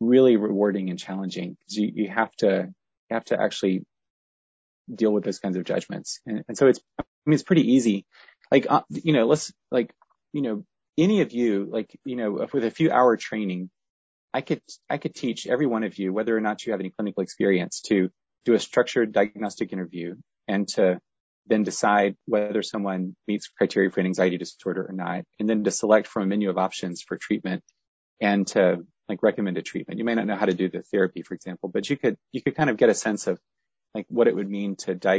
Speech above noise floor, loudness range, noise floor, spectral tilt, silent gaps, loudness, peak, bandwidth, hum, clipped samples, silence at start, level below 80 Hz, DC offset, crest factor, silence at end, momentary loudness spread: over 66 dB; 4 LU; under -90 dBFS; -5.5 dB/octave; 2.97-3.07 s, 4.10-4.85 s, 7.08-7.22 s, 13.90-14.28 s, 21.20-21.44 s, 27.88-28.17 s; -25 LUFS; -4 dBFS; 8 kHz; none; under 0.1%; 0 s; -66 dBFS; under 0.1%; 20 dB; 0 s; 12 LU